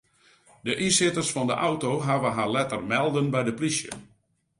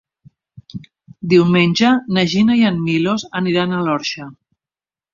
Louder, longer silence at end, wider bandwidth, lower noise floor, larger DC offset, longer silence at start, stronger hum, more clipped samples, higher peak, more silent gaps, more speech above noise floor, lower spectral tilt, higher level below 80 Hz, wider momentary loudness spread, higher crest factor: second, -25 LUFS vs -16 LUFS; second, 0.55 s vs 0.8 s; first, 11.5 kHz vs 7.4 kHz; second, -59 dBFS vs under -90 dBFS; neither; about the same, 0.65 s vs 0.75 s; neither; neither; second, -10 dBFS vs -2 dBFS; neither; second, 34 dB vs over 75 dB; second, -4 dB/octave vs -6 dB/octave; second, -62 dBFS vs -56 dBFS; second, 9 LU vs 22 LU; about the same, 18 dB vs 16 dB